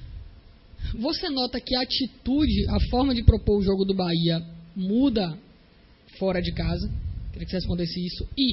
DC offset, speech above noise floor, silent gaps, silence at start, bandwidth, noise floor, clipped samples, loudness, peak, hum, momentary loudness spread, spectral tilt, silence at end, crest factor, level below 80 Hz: under 0.1%; 30 dB; none; 0 s; 6 kHz; -54 dBFS; under 0.1%; -25 LUFS; -2 dBFS; none; 13 LU; -9.5 dB/octave; 0 s; 24 dB; -32 dBFS